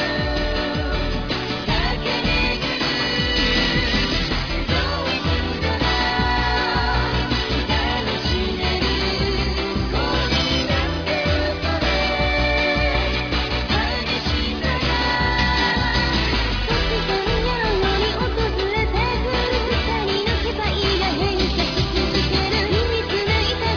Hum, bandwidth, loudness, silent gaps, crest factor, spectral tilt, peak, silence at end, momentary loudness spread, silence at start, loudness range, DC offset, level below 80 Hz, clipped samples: none; 5.4 kHz; -20 LUFS; none; 14 dB; -5 dB/octave; -6 dBFS; 0 s; 4 LU; 0 s; 1 LU; under 0.1%; -26 dBFS; under 0.1%